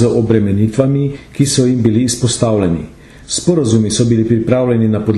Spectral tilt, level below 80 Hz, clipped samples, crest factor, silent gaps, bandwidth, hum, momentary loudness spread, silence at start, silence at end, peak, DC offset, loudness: -6 dB/octave; -40 dBFS; under 0.1%; 12 dB; none; 12.5 kHz; none; 5 LU; 0 s; 0 s; 0 dBFS; under 0.1%; -13 LUFS